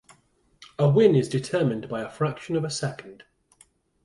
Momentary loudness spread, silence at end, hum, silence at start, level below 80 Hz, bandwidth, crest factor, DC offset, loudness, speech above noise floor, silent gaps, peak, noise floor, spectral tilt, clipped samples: 14 LU; 0.9 s; none; 0.6 s; -62 dBFS; 11.5 kHz; 20 dB; under 0.1%; -24 LUFS; 40 dB; none; -6 dBFS; -63 dBFS; -6.5 dB/octave; under 0.1%